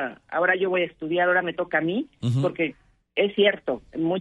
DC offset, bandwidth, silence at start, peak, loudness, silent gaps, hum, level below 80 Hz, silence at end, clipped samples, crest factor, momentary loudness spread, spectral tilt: under 0.1%; 9.6 kHz; 0 s; -6 dBFS; -24 LUFS; none; none; -62 dBFS; 0 s; under 0.1%; 18 dB; 8 LU; -7 dB/octave